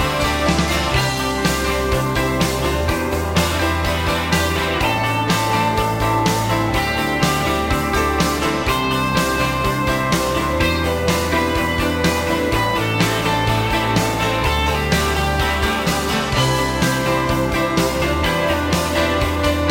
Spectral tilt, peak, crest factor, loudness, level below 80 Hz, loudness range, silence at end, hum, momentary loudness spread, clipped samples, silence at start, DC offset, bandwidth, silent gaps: -4.5 dB/octave; -2 dBFS; 16 dB; -18 LUFS; -28 dBFS; 1 LU; 0 s; none; 2 LU; under 0.1%; 0 s; 0.3%; 17 kHz; none